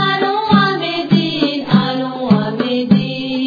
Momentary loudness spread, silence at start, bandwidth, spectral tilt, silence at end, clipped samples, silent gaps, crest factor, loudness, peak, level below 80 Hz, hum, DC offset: 6 LU; 0 s; 5 kHz; -7.5 dB/octave; 0 s; under 0.1%; none; 14 dB; -15 LUFS; 0 dBFS; -52 dBFS; none; under 0.1%